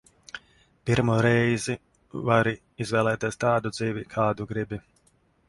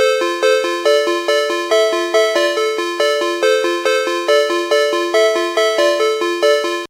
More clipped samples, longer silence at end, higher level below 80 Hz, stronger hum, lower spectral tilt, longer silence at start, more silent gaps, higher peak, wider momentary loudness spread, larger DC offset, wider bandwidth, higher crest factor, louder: neither; first, 0.7 s vs 0.05 s; first, -54 dBFS vs -84 dBFS; neither; first, -6 dB/octave vs 0 dB/octave; first, 0.35 s vs 0 s; neither; second, -6 dBFS vs 0 dBFS; first, 18 LU vs 2 LU; neither; second, 11.5 kHz vs 16 kHz; first, 20 dB vs 14 dB; second, -26 LUFS vs -15 LUFS